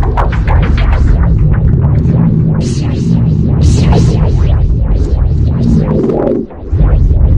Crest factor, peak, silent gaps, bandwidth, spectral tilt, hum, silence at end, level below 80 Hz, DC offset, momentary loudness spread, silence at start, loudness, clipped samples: 8 dB; 0 dBFS; none; 9 kHz; -8.5 dB/octave; none; 0 s; -12 dBFS; 1%; 4 LU; 0 s; -11 LUFS; under 0.1%